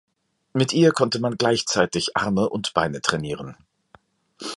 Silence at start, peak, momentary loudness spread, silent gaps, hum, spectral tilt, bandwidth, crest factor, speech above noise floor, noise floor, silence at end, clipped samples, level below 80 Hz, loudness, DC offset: 0.55 s; -2 dBFS; 13 LU; none; none; -4.5 dB/octave; 11.5 kHz; 22 dB; 35 dB; -56 dBFS; 0 s; under 0.1%; -54 dBFS; -22 LUFS; under 0.1%